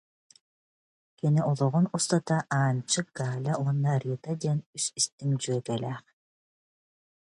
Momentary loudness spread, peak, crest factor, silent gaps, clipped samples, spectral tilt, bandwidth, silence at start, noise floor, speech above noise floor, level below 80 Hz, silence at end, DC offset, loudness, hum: 7 LU; -10 dBFS; 18 dB; 4.66-4.73 s, 5.12-5.18 s; under 0.1%; -5 dB/octave; 11.5 kHz; 1.25 s; under -90 dBFS; over 62 dB; -70 dBFS; 1.2 s; under 0.1%; -28 LUFS; none